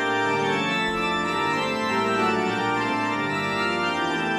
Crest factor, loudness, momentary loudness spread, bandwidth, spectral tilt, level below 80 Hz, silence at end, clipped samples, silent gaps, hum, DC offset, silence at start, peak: 12 dB; -23 LUFS; 2 LU; 15 kHz; -4.5 dB/octave; -56 dBFS; 0 s; under 0.1%; none; none; under 0.1%; 0 s; -12 dBFS